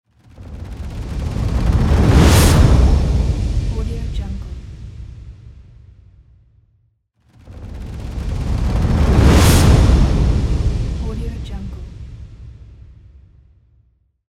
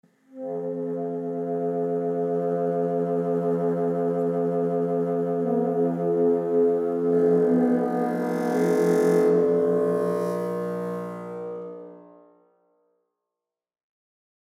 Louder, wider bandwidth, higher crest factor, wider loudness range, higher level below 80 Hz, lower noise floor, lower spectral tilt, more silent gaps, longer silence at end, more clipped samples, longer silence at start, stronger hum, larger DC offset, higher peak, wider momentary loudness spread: first, -16 LUFS vs -24 LUFS; first, 16 kHz vs 14 kHz; about the same, 16 dB vs 14 dB; first, 18 LU vs 12 LU; first, -20 dBFS vs -82 dBFS; second, -61 dBFS vs -89 dBFS; second, -6 dB/octave vs -8.5 dB/octave; neither; second, 1.55 s vs 2.4 s; neither; about the same, 0.4 s vs 0.35 s; neither; neither; first, 0 dBFS vs -10 dBFS; first, 24 LU vs 11 LU